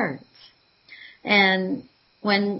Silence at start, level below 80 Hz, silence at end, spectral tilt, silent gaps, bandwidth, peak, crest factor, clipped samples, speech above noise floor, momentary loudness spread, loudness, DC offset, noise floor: 0 s; -72 dBFS; 0 s; -8.5 dB/octave; none; 5.8 kHz; -4 dBFS; 20 dB; under 0.1%; 33 dB; 21 LU; -21 LUFS; under 0.1%; -55 dBFS